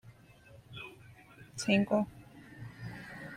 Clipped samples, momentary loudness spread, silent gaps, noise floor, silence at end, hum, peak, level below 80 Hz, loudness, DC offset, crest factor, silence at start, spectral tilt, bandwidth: under 0.1%; 26 LU; none; -57 dBFS; 0 s; none; -14 dBFS; -66 dBFS; -33 LUFS; under 0.1%; 22 dB; 0.05 s; -5.5 dB/octave; 13 kHz